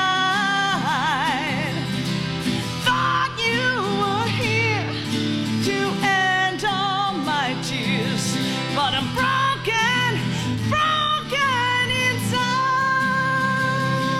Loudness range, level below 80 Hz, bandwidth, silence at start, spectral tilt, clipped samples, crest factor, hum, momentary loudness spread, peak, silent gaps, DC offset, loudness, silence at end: 2 LU; -50 dBFS; 16 kHz; 0 s; -4 dB/octave; under 0.1%; 16 dB; none; 5 LU; -6 dBFS; none; under 0.1%; -21 LUFS; 0 s